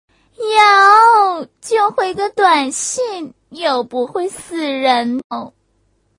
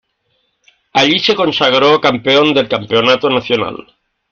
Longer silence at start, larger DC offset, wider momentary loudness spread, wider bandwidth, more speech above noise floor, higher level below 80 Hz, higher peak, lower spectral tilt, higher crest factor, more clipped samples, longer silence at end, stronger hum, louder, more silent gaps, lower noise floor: second, 0.4 s vs 0.95 s; neither; first, 17 LU vs 7 LU; first, 11 kHz vs 7.2 kHz; second, 43 dB vs 51 dB; second, -60 dBFS vs -54 dBFS; about the same, 0 dBFS vs 0 dBFS; second, -1.5 dB/octave vs -4.5 dB/octave; about the same, 16 dB vs 14 dB; neither; first, 0.7 s vs 0.5 s; neither; about the same, -14 LUFS vs -12 LUFS; first, 5.24-5.30 s vs none; about the same, -61 dBFS vs -63 dBFS